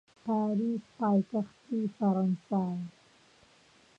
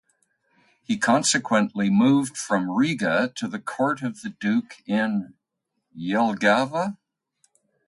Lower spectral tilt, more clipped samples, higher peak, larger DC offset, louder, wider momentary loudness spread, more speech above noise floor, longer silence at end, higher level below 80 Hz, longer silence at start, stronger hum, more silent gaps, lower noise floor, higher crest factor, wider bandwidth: first, -9.5 dB/octave vs -4.5 dB/octave; neither; second, -18 dBFS vs -6 dBFS; neither; second, -31 LUFS vs -23 LUFS; second, 7 LU vs 10 LU; second, 32 dB vs 57 dB; first, 1.1 s vs 0.9 s; second, -76 dBFS vs -68 dBFS; second, 0.25 s vs 0.9 s; neither; neither; second, -62 dBFS vs -79 dBFS; about the same, 14 dB vs 18 dB; second, 7.4 kHz vs 11.5 kHz